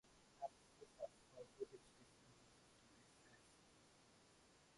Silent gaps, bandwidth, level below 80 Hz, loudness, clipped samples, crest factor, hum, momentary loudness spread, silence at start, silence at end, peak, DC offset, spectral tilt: none; 11.5 kHz; -84 dBFS; -60 LUFS; under 0.1%; 24 dB; none; 14 LU; 0.05 s; 0 s; -38 dBFS; under 0.1%; -4 dB/octave